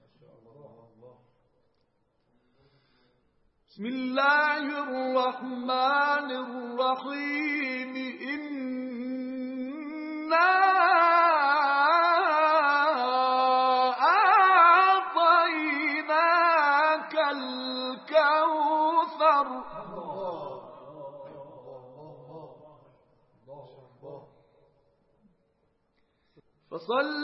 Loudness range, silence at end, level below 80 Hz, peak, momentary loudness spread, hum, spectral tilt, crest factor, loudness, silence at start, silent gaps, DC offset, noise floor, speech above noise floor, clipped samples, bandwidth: 11 LU; 0 s; -76 dBFS; -8 dBFS; 16 LU; none; -7 dB/octave; 18 dB; -24 LUFS; 1.05 s; none; under 0.1%; -72 dBFS; 46 dB; under 0.1%; 5.8 kHz